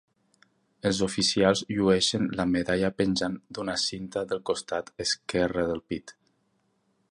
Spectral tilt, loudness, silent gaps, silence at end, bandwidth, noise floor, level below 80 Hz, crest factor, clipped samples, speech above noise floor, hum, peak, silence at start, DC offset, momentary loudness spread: -4 dB/octave; -27 LUFS; none; 1 s; 11.5 kHz; -72 dBFS; -54 dBFS; 20 dB; under 0.1%; 45 dB; none; -8 dBFS; 0.85 s; under 0.1%; 10 LU